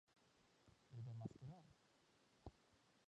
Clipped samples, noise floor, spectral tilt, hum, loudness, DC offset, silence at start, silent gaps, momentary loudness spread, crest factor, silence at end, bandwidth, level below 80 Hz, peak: under 0.1%; -77 dBFS; -7.5 dB/octave; none; -58 LUFS; under 0.1%; 0.1 s; none; 11 LU; 24 dB; 0.05 s; 9.4 kHz; -78 dBFS; -36 dBFS